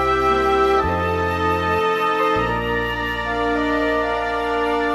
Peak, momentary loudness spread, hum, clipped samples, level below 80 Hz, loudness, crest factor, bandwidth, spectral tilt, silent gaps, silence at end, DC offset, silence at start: -6 dBFS; 5 LU; none; under 0.1%; -36 dBFS; -19 LUFS; 14 dB; 15 kHz; -6 dB/octave; none; 0 s; under 0.1%; 0 s